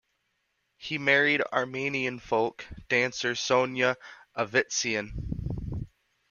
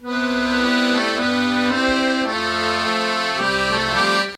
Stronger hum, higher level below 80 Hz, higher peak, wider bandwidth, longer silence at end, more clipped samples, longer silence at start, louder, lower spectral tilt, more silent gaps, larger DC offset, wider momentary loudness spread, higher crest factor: neither; about the same, -48 dBFS vs -46 dBFS; about the same, -8 dBFS vs -6 dBFS; second, 7.2 kHz vs 13.5 kHz; first, 0.45 s vs 0 s; neither; first, 0.8 s vs 0 s; second, -27 LUFS vs -19 LUFS; about the same, -3.5 dB/octave vs -3.5 dB/octave; neither; neither; first, 14 LU vs 3 LU; first, 22 dB vs 14 dB